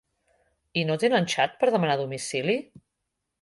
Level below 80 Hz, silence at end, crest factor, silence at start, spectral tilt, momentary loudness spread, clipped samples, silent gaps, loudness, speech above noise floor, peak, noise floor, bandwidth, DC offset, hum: -70 dBFS; 0.8 s; 18 dB; 0.75 s; -4.5 dB/octave; 7 LU; under 0.1%; none; -25 LUFS; 57 dB; -10 dBFS; -82 dBFS; 11.5 kHz; under 0.1%; none